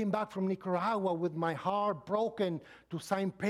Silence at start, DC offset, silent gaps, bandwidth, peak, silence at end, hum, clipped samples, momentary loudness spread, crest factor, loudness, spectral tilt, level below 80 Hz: 0 s; under 0.1%; none; 13.5 kHz; -16 dBFS; 0 s; none; under 0.1%; 4 LU; 18 dB; -34 LUFS; -7 dB/octave; -74 dBFS